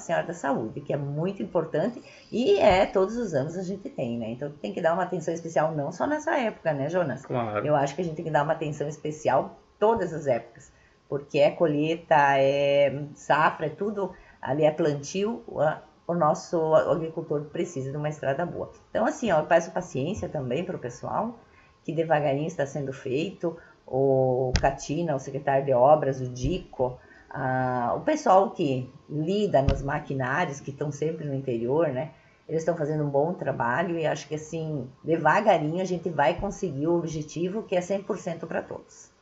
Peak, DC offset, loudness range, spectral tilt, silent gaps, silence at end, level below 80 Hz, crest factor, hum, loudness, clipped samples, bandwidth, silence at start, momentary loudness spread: -6 dBFS; under 0.1%; 4 LU; -6 dB/octave; none; 0.2 s; -48 dBFS; 20 dB; none; -26 LUFS; under 0.1%; 8 kHz; 0 s; 11 LU